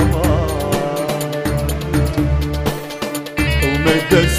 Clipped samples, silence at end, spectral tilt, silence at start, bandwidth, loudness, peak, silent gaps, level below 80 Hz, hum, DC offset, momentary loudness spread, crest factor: under 0.1%; 0 s; -5.5 dB/octave; 0 s; 16 kHz; -18 LUFS; 0 dBFS; none; -24 dBFS; none; under 0.1%; 8 LU; 16 dB